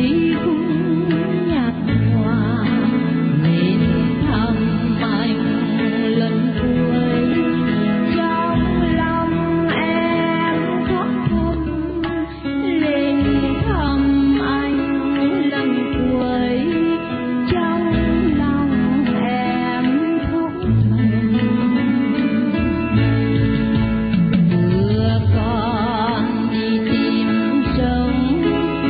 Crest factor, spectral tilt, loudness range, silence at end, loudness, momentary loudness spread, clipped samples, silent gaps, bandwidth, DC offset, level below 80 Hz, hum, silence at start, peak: 12 dB; -12.5 dB/octave; 2 LU; 0 s; -18 LUFS; 3 LU; under 0.1%; none; 5 kHz; under 0.1%; -32 dBFS; none; 0 s; -6 dBFS